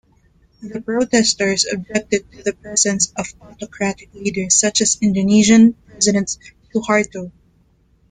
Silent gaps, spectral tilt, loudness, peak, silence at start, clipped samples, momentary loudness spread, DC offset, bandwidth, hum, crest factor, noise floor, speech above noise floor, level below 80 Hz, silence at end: none; -3 dB/octave; -16 LUFS; -2 dBFS; 0.6 s; under 0.1%; 17 LU; under 0.1%; 9.6 kHz; none; 16 dB; -57 dBFS; 39 dB; -50 dBFS; 0.8 s